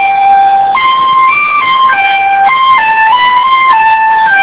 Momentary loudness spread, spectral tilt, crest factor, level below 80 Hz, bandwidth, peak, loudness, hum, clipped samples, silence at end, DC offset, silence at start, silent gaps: 2 LU; -4.5 dB/octave; 6 dB; -48 dBFS; 4 kHz; 0 dBFS; -6 LUFS; none; 0.6%; 0 s; under 0.1%; 0 s; none